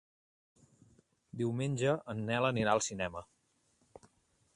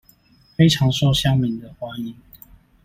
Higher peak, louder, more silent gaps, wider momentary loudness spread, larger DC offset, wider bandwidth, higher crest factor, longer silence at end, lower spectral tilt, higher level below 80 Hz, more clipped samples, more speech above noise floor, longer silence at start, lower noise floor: second, -14 dBFS vs -4 dBFS; second, -34 LUFS vs -19 LUFS; neither; second, 9 LU vs 17 LU; neither; second, 11 kHz vs 15.5 kHz; about the same, 22 dB vs 18 dB; first, 1.3 s vs 0.7 s; about the same, -5 dB/octave vs -5.5 dB/octave; second, -66 dBFS vs -44 dBFS; neither; first, 41 dB vs 36 dB; first, 1.35 s vs 0.6 s; first, -74 dBFS vs -54 dBFS